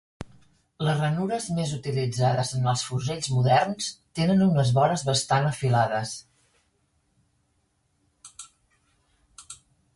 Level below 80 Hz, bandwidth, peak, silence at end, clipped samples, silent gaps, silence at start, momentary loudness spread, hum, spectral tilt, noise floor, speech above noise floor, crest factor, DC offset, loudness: -58 dBFS; 11.5 kHz; -8 dBFS; 0.4 s; under 0.1%; none; 0.2 s; 23 LU; none; -5.5 dB/octave; -71 dBFS; 47 dB; 18 dB; under 0.1%; -25 LUFS